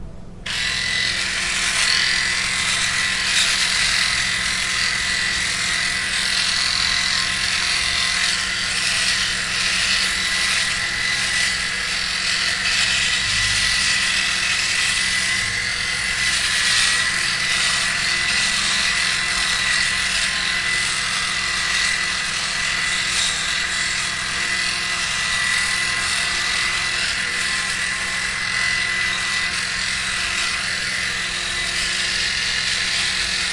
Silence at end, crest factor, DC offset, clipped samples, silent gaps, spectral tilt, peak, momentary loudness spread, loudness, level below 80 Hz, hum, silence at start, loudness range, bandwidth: 0 s; 18 dB; under 0.1%; under 0.1%; none; 0.5 dB/octave; -4 dBFS; 4 LU; -18 LUFS; -42 dBFS; none; 0 s; 3 LU; 11.5 kHz